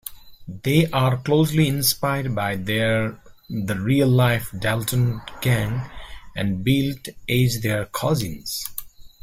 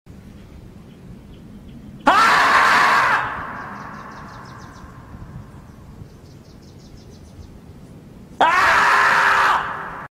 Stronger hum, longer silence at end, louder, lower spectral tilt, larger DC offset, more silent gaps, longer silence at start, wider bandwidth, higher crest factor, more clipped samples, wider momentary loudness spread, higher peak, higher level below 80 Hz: neither; about the same, 0.15 s vs 0.05 s; second, -22 LUFS vs -15 LUFS; first, -5.5 dB/octave vs -2.5 dB/octave; neither; neither; second, 0.05 s vs 0.35 s; about the same, 16 kHz vs 16 kHz; about the same, 18 dB vs 18 dB; neither; second, 13 LU vs 25 LU; about the same, -4 dBFS vs -2 dBFS; about the same, -44 dBFS vs -48 dBFS